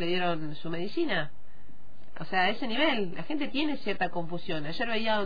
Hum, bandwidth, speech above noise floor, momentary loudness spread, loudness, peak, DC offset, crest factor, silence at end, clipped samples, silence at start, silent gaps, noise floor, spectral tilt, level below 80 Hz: none; 5 kHz; 24 dB; 9 LU; -30 LUFS; -12 dBFS; 4%; 18 dB; 0 s; under 0.1%; 0 s; none; -55 dBFS; -7 dB/octave; -60 dBFS